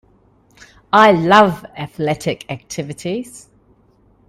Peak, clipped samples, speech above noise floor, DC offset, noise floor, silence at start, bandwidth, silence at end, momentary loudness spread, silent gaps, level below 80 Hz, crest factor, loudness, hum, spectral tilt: 0 dBFS; under 0.1%; 38 dB; under 0.1%; -54 dBFS; 0.95 s; 15.5 kHz; 0.9 s; 17 LU; none; -54 dBFS; 18 dB; -15 LUFS; none; -5 dB/octave